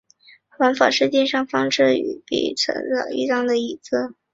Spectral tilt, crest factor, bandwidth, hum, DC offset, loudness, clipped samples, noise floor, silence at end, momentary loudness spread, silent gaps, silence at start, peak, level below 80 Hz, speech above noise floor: -3.5 dB/octave; 20 dB; 7.8 kHz; none; under 0.1%; -20 LUFS; under 0.1%; -53 dBFS; 0.2 s; 8 LU; none; 0.6 s; -2 dBFS; -64 dBFS; 33 dB